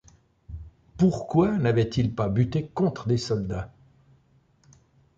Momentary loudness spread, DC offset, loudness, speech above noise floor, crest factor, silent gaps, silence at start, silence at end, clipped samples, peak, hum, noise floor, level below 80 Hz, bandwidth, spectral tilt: 21 LU; under 0.1%; -25 LUFS; 38 dB; 18 dB; none; 0.5 s; 1.5 s; under 0.1%; -8 dBFS; none; -62 dBFS; -48 dBFS; 7.8 kHz; -7.5 dB/octave